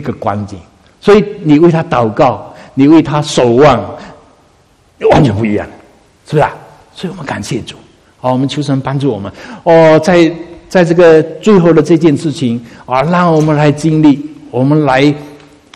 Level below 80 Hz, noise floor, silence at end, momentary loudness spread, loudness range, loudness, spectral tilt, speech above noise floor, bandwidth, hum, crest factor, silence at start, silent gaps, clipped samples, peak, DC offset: -40 dBFS; -48 dBFS; 0.4 s; 15 LU; 8 LU; -10 LUFS; -7 dB/octave; 39 dB; 11.5 kHz; none; 10 dB; 0 s; none; 0.7%; 0 dBFS; under 0.1%